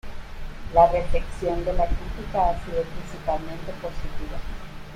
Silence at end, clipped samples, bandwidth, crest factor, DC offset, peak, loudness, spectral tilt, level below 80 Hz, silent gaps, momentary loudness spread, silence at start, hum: 0 s; under 0.1%; 10 kHz; 20 dB; under 0.1%; -4 dBFS; -26 LUFS; -6.5 dB/octave; -32 dBFS; none; 21 LU; 0.05 s; none